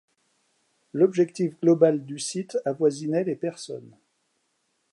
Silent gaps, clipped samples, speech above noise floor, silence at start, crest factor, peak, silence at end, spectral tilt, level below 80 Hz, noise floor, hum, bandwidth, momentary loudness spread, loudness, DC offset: none; under 0.1%; 49 dB; 0.95 s; 20 dB; -6 dBFS; 1.05 s; -6 dB/octave; -80 dBFS; -73 dBFS; none; 11.5 kHz; 15 LU; -24 LUFS; under 0.1%